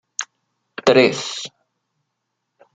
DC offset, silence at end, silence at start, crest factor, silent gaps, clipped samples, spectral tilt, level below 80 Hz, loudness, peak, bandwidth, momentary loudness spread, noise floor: under 0.1%; 1.25 s; 0.2 s; 20 dB; none; under 0.1%; -3.5 dB/octave; -64 dBFS; -18 LUFS; -2 dBFS; 9.4 kHz; 21 LU; -76 dBFS